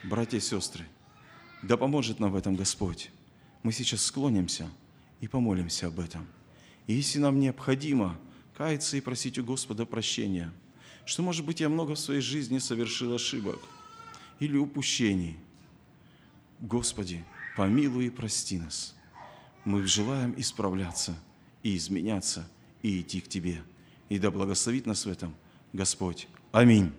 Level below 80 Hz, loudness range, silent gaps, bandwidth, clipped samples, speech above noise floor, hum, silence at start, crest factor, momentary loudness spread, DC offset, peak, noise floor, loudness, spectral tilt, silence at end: -58 dBFS; 3 LU; none; 14 kHz; under 0.1%; 28 dB; none; 0 s; 24 dB; 16 LU; under 0.1%; -6 dBFS; -58 dBFS; -30 LUFS; -4.5 dB/octave; 0 s